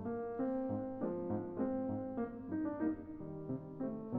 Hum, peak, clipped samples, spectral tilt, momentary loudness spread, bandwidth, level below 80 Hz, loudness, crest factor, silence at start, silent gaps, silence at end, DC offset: none; -24 dBFS; under 0.1%; -10.5 dB/octave; 6 LU; 3.1 kHz; -64 dBFS; -41 LUFS; 16 dB; 0 s; none; 0 s; under 0.1%